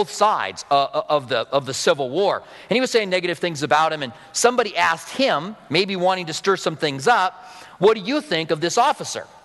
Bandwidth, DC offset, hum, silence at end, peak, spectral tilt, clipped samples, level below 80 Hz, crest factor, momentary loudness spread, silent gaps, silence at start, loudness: 12 kHz; under 0.1%; none; 0.2 s; -2 dBFS; -3.5 dB/octave; under 0.1%; -66 dBFS; 18 dB; 6 LU; none; 0 s; -20 LUFS